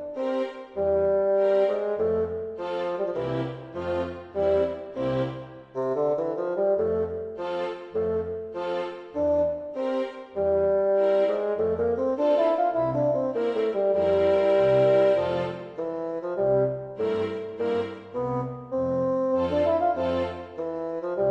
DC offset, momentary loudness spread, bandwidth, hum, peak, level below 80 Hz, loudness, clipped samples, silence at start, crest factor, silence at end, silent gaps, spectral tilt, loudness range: under 0.1%; 10 LU; 7.4 kHz; none; -12 dBFS; -56 dBFS; -26 LUFS; under 0.1%; 0 s; 14 dB; 0 s; none; -8 dB/octave; 5 LU